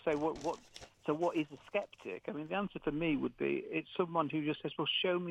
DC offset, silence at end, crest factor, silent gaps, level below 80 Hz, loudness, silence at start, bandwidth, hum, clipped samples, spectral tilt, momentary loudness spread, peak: under 0.1%; 0 s; 18 dB; none; -64 dBFS; -37 LUFS; 0.05 s; 10 kHz; none; under 0.1%; -6 dB/octave; 9 LU; -18 dBFS